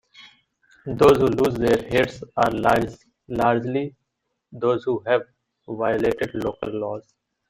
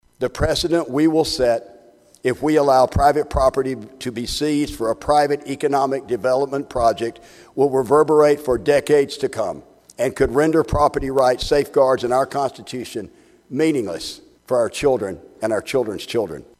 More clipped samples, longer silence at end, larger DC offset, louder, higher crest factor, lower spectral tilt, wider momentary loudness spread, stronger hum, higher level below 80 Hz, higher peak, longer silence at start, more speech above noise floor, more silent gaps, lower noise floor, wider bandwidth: neither; first, 0.5 s vs 0.2 s; neither; second, -22 LUFS vs -19 LUFS; about the same, 22 dB vs 18 dB; first, -6.5 dB/octave vs -5 dB/octave; about the same, 14 LU vs 12 LU; neither; second, -48 dBFS vs -38 dBFS; about the same, -2 dBFS vs -2 dBFS; about the same, 0.2 s vs 0.2 s; first, 56 dB vs 31 dB; neither; first, -77 dBFS vs -50 dBFS; first, 16 kHz vs 14.5 kHz